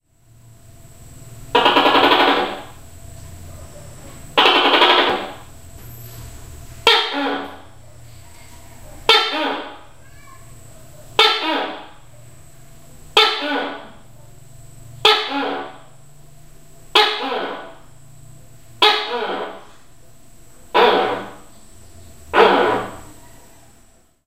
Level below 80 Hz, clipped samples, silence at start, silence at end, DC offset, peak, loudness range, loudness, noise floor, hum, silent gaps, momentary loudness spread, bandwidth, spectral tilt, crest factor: -48 dBFS; under 0.1%; 1.1 s; 1.15 s; 0.8%; 0 dBFS; 5 LU; -16 LUFS; -53 dBFS; none; none; 26 LU; 16 kHz; -3 dB/octave; 20 dB